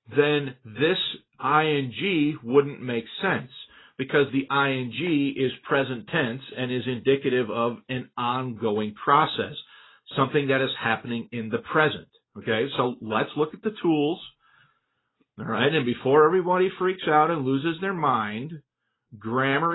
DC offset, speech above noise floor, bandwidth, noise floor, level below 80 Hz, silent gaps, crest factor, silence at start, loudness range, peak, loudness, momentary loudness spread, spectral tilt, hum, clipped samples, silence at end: under 0.1%; 49 dB; 4.1 kHz; -73 dBFS; -66 dBFS; none; 20 dB; 0.1 s; 4 LU; -6 dBFS; -25 LUFS; 11 LU; -10.5 dB/octave; none; under 0.1%; 0 s